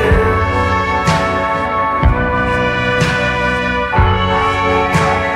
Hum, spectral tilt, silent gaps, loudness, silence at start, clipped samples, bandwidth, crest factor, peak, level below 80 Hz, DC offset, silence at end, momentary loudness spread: none; -5.5 dB/octave; none; -14 LUFS; 0 s; under 0.1%; 13.5 kHz; 14 dB; 0 dBFS; -24 dBFS; under 0.1%; 0 s; 2 LU